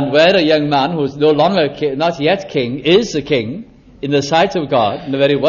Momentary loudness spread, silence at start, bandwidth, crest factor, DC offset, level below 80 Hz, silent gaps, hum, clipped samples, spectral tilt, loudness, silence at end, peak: 7 LU; 0 s; 7.2 kHz; 14 dB; under 0.1%; -48 dBFS; none; none; under 0.1%; -5.5 dB/octave; -14 LUFS; 0 s; 0 dBFS